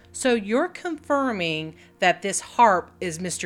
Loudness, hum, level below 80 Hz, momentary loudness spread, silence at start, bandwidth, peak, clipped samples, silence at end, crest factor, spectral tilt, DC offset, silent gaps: -23 LUFS; none; -64 dBFS; 12 LU; 0.15 s; 16.5 kHz; -4 dBFS; under 0.1%; 0 s; 20 dB; -3.5 dB/octave; under 0.1%; none